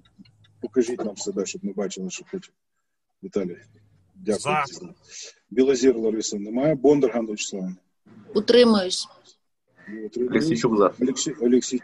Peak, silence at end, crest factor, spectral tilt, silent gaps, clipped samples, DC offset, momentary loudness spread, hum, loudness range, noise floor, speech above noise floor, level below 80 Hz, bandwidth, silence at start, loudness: -4 dBFS; 0.05 s; 20 dB; -4.5 dB/octave; none; under 0.1%; under 0.1%; 19 LU; none; 9 LU; -80 dBFS; 57 dB; -62 dBFS; 11.5 kHz; 0.65 s; -23 LUFS